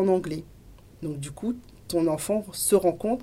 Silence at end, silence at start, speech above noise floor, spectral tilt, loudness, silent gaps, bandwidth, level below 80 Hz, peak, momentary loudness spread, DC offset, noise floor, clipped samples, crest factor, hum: 0 s; 0 s; 24 dB; -5 dB/octave; -27 LUFS; none; 16 kHz; -54 dBFS; -8 dBFS; 14 LU; under 0.1%; -50 dBFS; under 0.1%; 18 dB; none